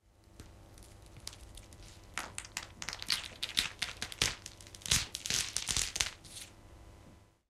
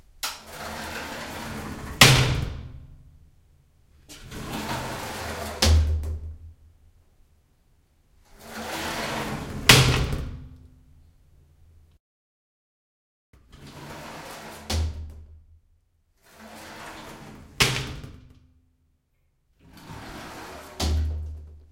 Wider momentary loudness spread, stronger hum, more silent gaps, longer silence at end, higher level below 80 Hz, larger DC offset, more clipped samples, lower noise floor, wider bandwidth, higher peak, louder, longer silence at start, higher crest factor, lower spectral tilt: second, 24 LU vs 27 LU; neither; second, none vs 12.00-13.33 s; first, 0.25 s vs 0.1 s; second, -54 dBFS vs -38 dBFS; neither; neither; second, -59 dBFS vs -69 dBFS; about the same, 16 kHz vs 16.5 kHz; second, -6 dBFS vs 0 dBFS; second, -35 LUFS vs -24 LUFS; about the same, 0.3 s vs 0.25 s; first, 34 dB vs 28 dB; second, -0.5 dB/octave vs -3.5 dB/octave